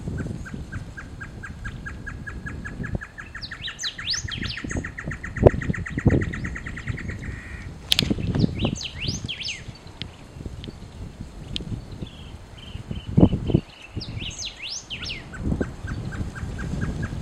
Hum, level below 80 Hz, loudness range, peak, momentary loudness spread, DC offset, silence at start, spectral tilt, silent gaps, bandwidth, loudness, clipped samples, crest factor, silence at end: none; -36 dBFS; 10 LU; 0 dBFS; 17 LU; under 0.1%; 0 s; -5 dB/octave; none; 16 kHz; -27 LUFS; under 0.1%; 28 dB; 0 s